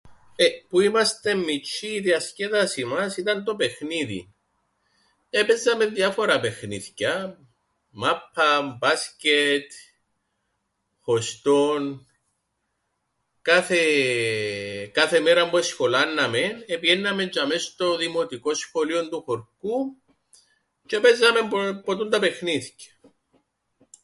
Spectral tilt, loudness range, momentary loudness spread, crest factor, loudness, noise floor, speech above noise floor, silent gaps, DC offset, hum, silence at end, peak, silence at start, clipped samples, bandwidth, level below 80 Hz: -3 dB/octave; 5 LU; 10 LU; 20 dB; -23 LUFS; -76 dBFS; 53 dB; none; under 0.1%; none; 1.2 s; -4 dBFS; 0.05 s; under 0.1%; 11.5 kHz; -66 dBFS